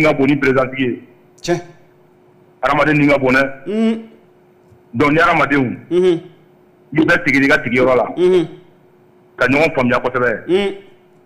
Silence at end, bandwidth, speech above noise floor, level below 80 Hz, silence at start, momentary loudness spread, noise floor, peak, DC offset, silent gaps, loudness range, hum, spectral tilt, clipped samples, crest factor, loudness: 0.45 s; 14.5 kHz; 35 dB; -44 dBFS; 0 s; 10 LU; -49 dBFS; -6 dBFS; under 0.1%; none; 3 LU; none; -6.5 dB/octave; under 0.1%; 10 dB; -15 LUFS